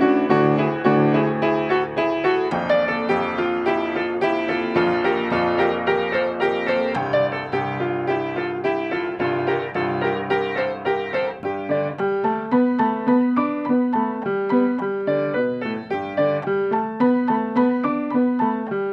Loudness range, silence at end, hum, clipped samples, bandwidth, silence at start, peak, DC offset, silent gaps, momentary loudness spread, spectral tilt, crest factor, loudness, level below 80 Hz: 3 LU; 0 s; none; under 0.1%; 6.6 kHz; 0 s; -2 dBFS; under 0.1%; none; 5 LU; -8 dB/octave; 18 dB; -21 LUFS; -58 dBFS